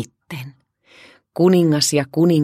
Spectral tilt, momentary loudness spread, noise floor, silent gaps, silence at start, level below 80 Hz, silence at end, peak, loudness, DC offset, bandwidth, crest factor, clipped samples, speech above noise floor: -5.5 dB/octave; 19 LU; -49 dBFS; none; 0 s; -64 dBFS; 0 s; -4 dBFS; -16 LUFS; under 0.1%; 15.5 kHz; 16 dB; under 0.1%; 33 dB